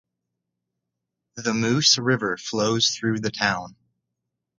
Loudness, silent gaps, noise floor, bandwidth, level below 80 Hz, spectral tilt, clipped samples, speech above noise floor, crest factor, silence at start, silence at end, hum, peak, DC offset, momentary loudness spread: -22 LUFS; none; -83 dBFS; 10 kHz; -62 dBFS; -3 dB/octave; under 0.1%; 60 dB; 20 dB; 1.35 s; 0.9 s; none; -6 dBFS; under 0.1%; 9 LU